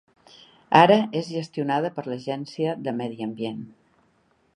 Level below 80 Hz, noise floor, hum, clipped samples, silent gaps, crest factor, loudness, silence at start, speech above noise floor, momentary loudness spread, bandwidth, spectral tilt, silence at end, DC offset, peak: -72 dBFS; -65 dBFS; none; under 0.1%; none; 24 dB; -23 LUFS; 0.7 s; 42 dB; 15 LU; 10.5 kHz; -6.5 dB/octave; 0.9 s; under 0.1%; 0 dBFS